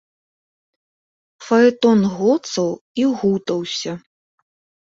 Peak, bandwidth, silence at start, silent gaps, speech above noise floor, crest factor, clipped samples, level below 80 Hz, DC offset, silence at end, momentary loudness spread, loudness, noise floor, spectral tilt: -2 dBFS; 7.8 kHz; 1.4 s; 2.81-2.95 s; over 73 dB; 18 dB; under 0.1%; -62 dBFS; under 0.1%; 0.9 s; 11 LU; -18 LUFS; under -90 dBFS; -5.5 dB/octave